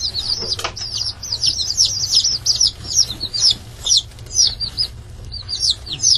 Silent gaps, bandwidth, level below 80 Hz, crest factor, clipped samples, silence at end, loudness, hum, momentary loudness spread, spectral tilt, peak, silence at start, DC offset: none; 14 kHz; -38 dBFS; 18 dB; under 0.1%; 0 s; -16 LUFS; none; 8 LU; 0.5 dB/octave; -2 dBFS; 0 s; under 0.1%